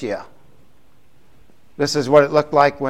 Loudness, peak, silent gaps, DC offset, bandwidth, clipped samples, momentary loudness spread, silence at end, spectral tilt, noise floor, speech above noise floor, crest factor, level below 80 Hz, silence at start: -17 LUFS; 0 dBFS; none; 0.7%; 14 kHz; under 0.1%; 13 LU; 0 s; -5 dB/octave; -57 dBFS; 41 dB; 20 dB; -56 dBFS; 0 s